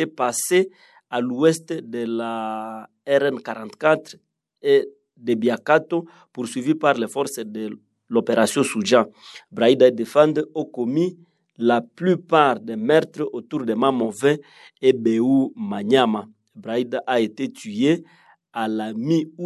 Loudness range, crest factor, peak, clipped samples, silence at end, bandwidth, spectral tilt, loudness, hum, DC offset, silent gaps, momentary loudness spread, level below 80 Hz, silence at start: 4 LU; 20 dB; 0 dBFS; under 0.1%; 0 s; 12.5 kHz; -5 dB/octave; -21 LUFS; none; under 0.1%; none; 12 LU; -74 dBFS; 0 s